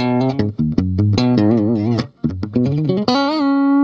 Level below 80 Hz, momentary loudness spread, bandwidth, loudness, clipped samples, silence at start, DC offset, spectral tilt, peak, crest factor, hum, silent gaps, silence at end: -42 dBFS; 6 LU; 7.2 kHz; -17 LUFS; under 0.1%; 0 s; under 0.1%; -8 dB/octave; -2 dBFS; 14 dB; none; none; 0 s